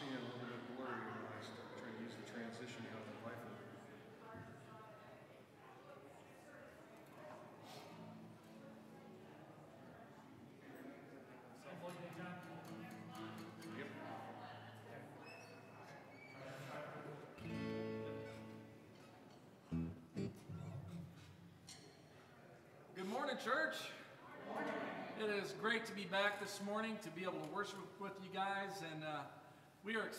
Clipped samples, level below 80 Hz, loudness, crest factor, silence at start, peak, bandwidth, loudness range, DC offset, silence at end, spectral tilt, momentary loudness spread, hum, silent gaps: under 0.1%; -78 dBFS; -48 LUFS; 24 dB; 0 s; -26 dBFS; 15.5 kHz; 16 LU; under 0.1%; 0 s; -5 dB/octave; 18 LU; none; none